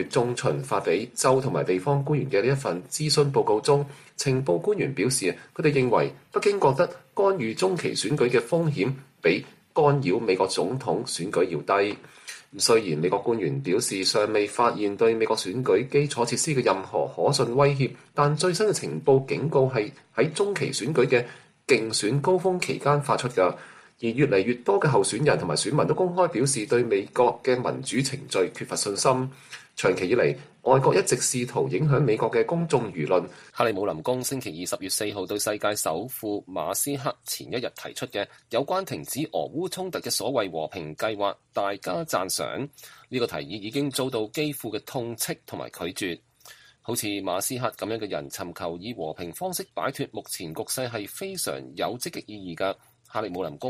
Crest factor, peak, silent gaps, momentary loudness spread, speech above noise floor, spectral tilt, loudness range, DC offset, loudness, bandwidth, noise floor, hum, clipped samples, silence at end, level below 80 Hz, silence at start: 20 dB; -6 dBFS; none; 11 LU; 26 dB; -4.5 dB/octave; 7 LU; under 0.1%; -25 LUFS; 15 kHz; -52 dBFS; none; under 0.1%; 0 s; -64 dBFS; 0 s